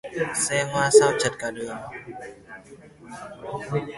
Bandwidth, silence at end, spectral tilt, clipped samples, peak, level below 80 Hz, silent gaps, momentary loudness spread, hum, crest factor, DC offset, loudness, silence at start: 11.5 kHz; 0 s; -3.5 dB/octave; under 0.1%; -2 dBFS; -58 dBFS; none; 25 LU; none; 22 dB; under 0.1%; -22 LUFS; 0.05 s